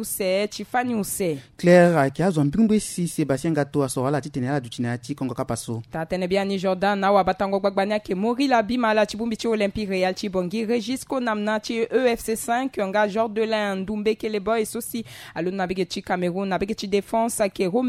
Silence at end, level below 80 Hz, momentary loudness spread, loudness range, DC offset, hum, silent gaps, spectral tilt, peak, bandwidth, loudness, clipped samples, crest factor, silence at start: 0 s; -52 dBFS; 8 LU; 5 LU; under 0.1%; none; none; -5.5 dB/octave; -2 dBFS; 16 kHz; -23 LUFS; under 0.1%; 20 dB; 0 s